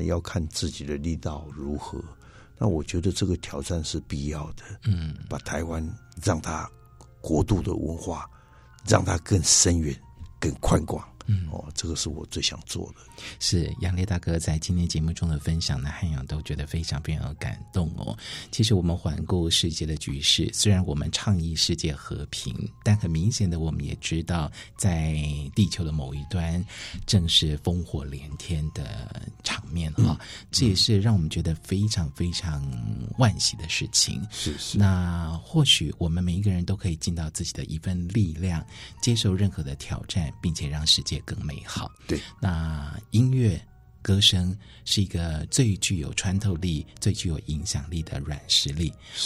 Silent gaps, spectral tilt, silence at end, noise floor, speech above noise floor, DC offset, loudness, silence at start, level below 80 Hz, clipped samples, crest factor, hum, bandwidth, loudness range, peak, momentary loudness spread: none; -4.5 dB/octave; 0 s; -48 dBFS; 23 dB; under 0.1%; -26 LUFS; 0 s; -38 dBFS; under 0.1%; 22 dB; none; 14.5 kHz; 6 LU; -4 dBFS; 13 LU